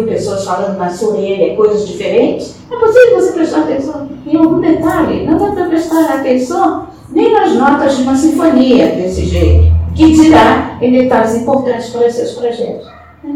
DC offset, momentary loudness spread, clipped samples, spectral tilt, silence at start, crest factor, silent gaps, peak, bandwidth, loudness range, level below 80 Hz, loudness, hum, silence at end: 0.1%; 10 LU; 0.7%; -6.5 dB/octave; 0 s; 10 dB; none; 0 dBFS; 15 kHz; 3 LU; -24 dBFS; -11 LUFS; none; 0 s